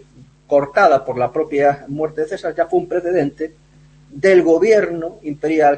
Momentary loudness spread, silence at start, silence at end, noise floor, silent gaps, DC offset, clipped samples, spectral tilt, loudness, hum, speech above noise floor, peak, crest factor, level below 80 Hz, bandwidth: 11 LU; 0.5 s; 0 s; -47 dBFS; none; under 0.1%; under 0.1%; -6.5 dB/octave; -17 LUFS; none; 31 dB; -2 dBFS; 16 dB; -54 dBFS; 8.6 kHz